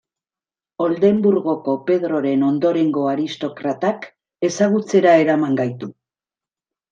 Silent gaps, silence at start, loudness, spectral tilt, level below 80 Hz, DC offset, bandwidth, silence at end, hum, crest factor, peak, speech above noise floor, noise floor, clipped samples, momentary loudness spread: none; 0.8 s; -18 LUFS; -6.5 dB/octave; -68 dBFS; under 0.1%; 9 kHz; 1 s; none; 16 dB; -2 dBFS; over 73 dB; under -90 dBFS; under 0.1%; 11 LU